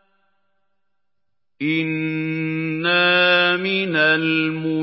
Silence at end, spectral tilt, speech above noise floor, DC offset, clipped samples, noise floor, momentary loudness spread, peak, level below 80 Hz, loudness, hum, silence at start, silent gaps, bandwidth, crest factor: 0 s; -10 dB/octave; 62 dB; under 0.1%; under 0.1%; -82 dBFS; 9 LU; -4 dBFS; -74 dBFS; -18 LUFS; none; 1.6 s; none; 5.8 kHz; 18 dB